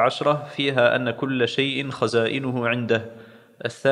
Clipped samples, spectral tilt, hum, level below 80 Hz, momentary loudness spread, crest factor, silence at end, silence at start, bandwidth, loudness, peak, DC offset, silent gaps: under 0.1%; -5.5 dB/octave; none; -70 dBFS; 6 LU; 20 dB; 0 s; 0 s; 11 kHz; -23 LUFS; -4 dBFS; under 0.1%; none